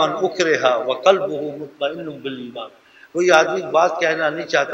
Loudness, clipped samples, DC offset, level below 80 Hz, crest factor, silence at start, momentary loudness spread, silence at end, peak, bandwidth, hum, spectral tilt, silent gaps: -18 LUFS; under 0.1%; under 0.1%; -70 dBFS; 20 dB; 0 s; 15 LU; 0 s; 0 dBFS; 11 kHz; none; -3.5 dB/octave; none